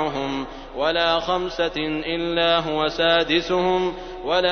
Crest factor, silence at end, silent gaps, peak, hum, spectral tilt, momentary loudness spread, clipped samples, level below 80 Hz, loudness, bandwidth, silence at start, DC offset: 16 dB; 0 s; none; -6 dBFS; none; -5 dB/octave; 8 LU; under 0.1%; -44 dBFS; -22 LUFS; 6.6 kHz; 0 s; under 0.1%